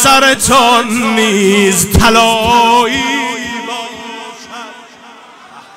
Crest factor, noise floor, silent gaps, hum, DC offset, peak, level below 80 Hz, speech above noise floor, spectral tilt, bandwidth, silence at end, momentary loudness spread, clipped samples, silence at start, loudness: 12 dB; -36 dBFS; none; none; under 0.1%; 0 dBFS; -30 dBFS; 27 dB; -3 dB/octave; 16.5 kHz; 0.15 s; 20 LU; under 0.1%; 0 s; -9 LUFS